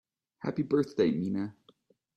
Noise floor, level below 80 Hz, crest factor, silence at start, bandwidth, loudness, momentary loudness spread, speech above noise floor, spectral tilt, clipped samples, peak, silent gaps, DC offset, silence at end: -65 dBFS; -70 dBFS; 18 dB; 0.45 s; 9 kHz; -31 LUFS; 10 LU; 36 dB; -8 dB/octave; under 0.1%; -14 dBFS; none; under 0.1%; 0.65 s